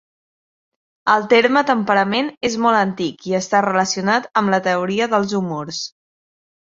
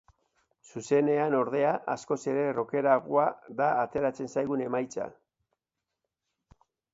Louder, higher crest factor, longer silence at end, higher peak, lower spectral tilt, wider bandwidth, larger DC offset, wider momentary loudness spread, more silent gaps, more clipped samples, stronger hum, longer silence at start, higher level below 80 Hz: first, -18 LUFS vs -28 LUFS; about the same, 18 dB vs 20 dB; second, 0.9 s vs 1.85 s; first, -2 dBFS vs -10 dBFS; second, -4.5 dB/octave vs -6.5 dB/octave; about the same, 7.8 kHz vs 8 kHz; neither; about the same, 11 LU vs 9 LU; first, 2.37-2.41 s vs none; neither; neither; first, 1.05 s vs 0.75 s; first, -60 dBFS vs -70 dBFS